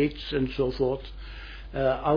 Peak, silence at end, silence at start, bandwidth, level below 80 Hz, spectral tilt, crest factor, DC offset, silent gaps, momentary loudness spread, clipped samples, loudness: -12 dBFS; 0 s; 0 s; 5.2 kHz; -40 dBFS; -8.5 dB/octave; 16 dB; under 0.1%; none; 15 LU; under 0.1%; -28 LUFS